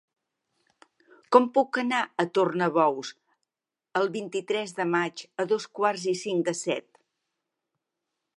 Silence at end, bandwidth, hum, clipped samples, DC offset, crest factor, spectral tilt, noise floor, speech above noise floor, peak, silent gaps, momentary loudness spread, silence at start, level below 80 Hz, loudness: 1.6 s; 11.5 kHz; none; under 0.1%; under 0.1%; 26 dB; -4.5 dB/octave; -90 dBFS; 64 dB; -2 dBFS; none; 10 LU; 1.3 s; -82 dBFS; -26 LUFS